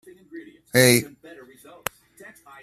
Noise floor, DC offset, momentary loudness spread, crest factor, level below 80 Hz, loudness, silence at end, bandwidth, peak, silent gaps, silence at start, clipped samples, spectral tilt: -49 dBFS; under 0.1%; 26 LU; 24 dB; -62 dBFS; -18 LUFS; 1.55 s; 15 kHz; 0 dBFS; none; 0.35 s; under 0.1%; -3.5 dB/octave